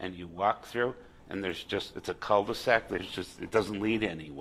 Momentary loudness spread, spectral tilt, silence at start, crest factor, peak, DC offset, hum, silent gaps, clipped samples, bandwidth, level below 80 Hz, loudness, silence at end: 11 LU; -5 dB/octave; 0 s; 24 dB; -8 dBFS; under 0.1%; none; none; under 0.1%; 15.5 kHz; -58 dBFS; -31 LUFS; 0 s